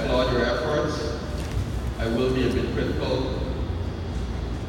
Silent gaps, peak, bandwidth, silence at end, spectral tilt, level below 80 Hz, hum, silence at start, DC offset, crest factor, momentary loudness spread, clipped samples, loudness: none; -10 dBFS; 16 kHz; 0 s; -6.5 dB/octave; -32 dBFS; none; 0 s; under 0.1%; 16 dB; 8 LU; under 0.1%; -26 LUFS